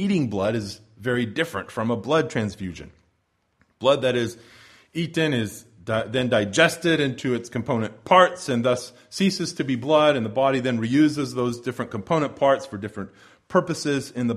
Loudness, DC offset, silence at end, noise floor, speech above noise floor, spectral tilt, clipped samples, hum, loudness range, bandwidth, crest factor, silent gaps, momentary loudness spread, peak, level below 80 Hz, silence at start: -23 LUFS; under 0.1%; 0 s; -70 dBFS; 47 dB; -5.5 dB/octave; under 0.1%; none; 5 LU; 15 kHz; 22 dB; none; 13 LU; -2 dBFS; -58 dBFS; 0 s